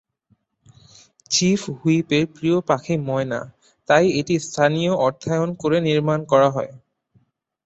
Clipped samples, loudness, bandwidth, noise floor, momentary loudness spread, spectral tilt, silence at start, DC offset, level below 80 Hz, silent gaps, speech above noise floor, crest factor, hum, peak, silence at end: under 0.1%; -20 LUFS; 8.2 kHz; -65 dBFS; 8 LU; -5 dB/octave; 1.3 s; under 0.1%; -58 dBFS; none; 45 dB; 18 dB; none; -2 dBFS; 0.9 s